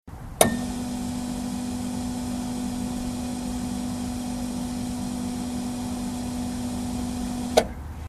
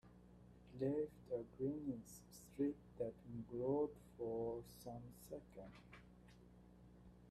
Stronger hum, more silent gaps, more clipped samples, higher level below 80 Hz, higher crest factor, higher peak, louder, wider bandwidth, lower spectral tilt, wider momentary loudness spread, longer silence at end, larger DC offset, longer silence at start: second, none vs 60 Hz at -70 dBFS; neither; neither; first, -42 dBFS vs -70 dBFS; first, 28 dB vs 18 dB; first, 0 dBFS vs -30 dBFS; first, -28 LUFS vs -47 LUFS; first, 15.5 kHz vs 14 kHz; second, -4.5 dB/octave vs -7.5 dB/octave; second, 7 LU vs 23 LU; about the same, 0 s vs 0 s; neither; about the same, 0.05 s vs 0.05 s